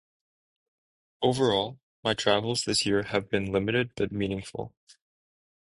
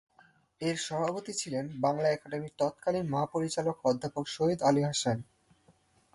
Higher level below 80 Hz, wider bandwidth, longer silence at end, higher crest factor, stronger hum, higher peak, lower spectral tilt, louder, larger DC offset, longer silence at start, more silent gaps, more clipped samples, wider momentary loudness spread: first, -56 dBFS vs -68 dBFS; about the same, 11.5 kHz vs 11.5 kHz; first, 1.1 s vs 0.9 s; about the same, 22 dB vs 18 dB; neither; first, -8 dBFS vs -14 dBFS; about the same, -4.5 dB/octave vs -5 dB/octave; first, -27 LUFS vs -31 LUFS; neither; first, 1.2 s vs 0.6 s; first, 1.83-2.03 s vs none; neither; about the same, 10 LU vs 8 LU